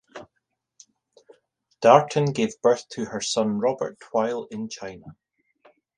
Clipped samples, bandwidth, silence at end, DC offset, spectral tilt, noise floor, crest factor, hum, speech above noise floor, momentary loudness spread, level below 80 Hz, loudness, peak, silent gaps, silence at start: under 0.1%; 10 kHz; 0.85 s; under 0.1%; -5 dB/octave; -78 dBFS; 24 dB; none; 55 dB; 20 LU; -66 dBFS; -23 LUFS; 0 dBFS; none; 0.15 s